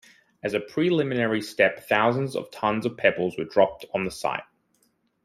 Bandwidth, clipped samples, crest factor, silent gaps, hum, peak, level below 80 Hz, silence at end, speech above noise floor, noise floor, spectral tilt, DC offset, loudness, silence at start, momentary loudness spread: 15.5 kHz; under 0.1%; 22 dB; none; none; -4 dBFS; -62 dBFS; 0.8 s; 44 dB; -68 dBFS; -6 dB/octave; under 0.1%; -25 LUFS; 0.45 s; 8 LU